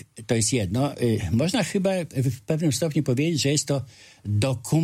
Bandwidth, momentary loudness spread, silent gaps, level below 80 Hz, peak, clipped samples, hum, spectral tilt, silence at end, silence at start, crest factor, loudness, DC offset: 16 kHz; 5 LU; none; -52 dBFS; -8 dBFS; under 0.1%; none; -5 dB/octave; 0 s; 0.15 s; 16 dB; -24 LUFS; under 0.1%